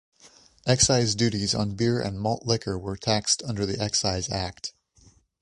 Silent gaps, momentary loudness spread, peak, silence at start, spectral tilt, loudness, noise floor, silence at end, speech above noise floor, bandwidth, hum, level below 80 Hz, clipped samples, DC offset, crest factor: none; 11 LU; -4 dBFS; 0.25 s; -4 dB/octave; -25 LUFS; -58 dBFS; 0.7 s; 33 dB; 11.5 kHz; none; -48 dBFS; under 0.1%; under 0.1%; 22 dB